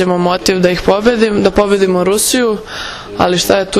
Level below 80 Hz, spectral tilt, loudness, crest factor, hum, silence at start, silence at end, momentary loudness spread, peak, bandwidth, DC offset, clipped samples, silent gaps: -34 dBFS; -4 dB/octave; -12 LUFS; 12 dB; none; 0 s; 0 s; 8 LU; 0 dBFS; 14.5 kHz; under 0.1%; 0.5%; none